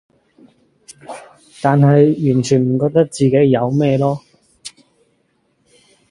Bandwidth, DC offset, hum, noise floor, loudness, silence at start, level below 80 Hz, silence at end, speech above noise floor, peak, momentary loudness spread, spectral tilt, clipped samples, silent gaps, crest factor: 11.5 kHz; under 0.1%; none; -62 dBFS; -14 LUFS; 1.1 s; -54 dBFS; 1.4 s; 48 dB; 0 dBFS; 24 LU; -7.5 dB/octave; under 0.1%; none; 16 dB